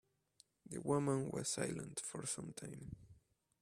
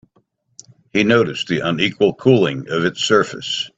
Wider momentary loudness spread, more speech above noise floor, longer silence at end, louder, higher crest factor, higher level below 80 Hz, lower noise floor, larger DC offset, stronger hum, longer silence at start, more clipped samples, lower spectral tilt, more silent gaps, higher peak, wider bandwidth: first, 15 LU vs 6 LU; second, 31 dB vs 45 dB; first, 0.5 s vs 0.1 s; second, -42 LUFS vs -17 LUFS; about the same, 22 dB vs 18 dB; second, -72 dBFS vs -56 dBFS; first, -73 dBFS vs -62 dBFS; neither; neither; second, 0.65 s vs 0.95 s; neither; about the same, -4.5 dB/octave vs -5 dB/octave; neither; second, -22 dBFS vs 0 dBFS; first, 15.5 kHz vs 8.4 kHz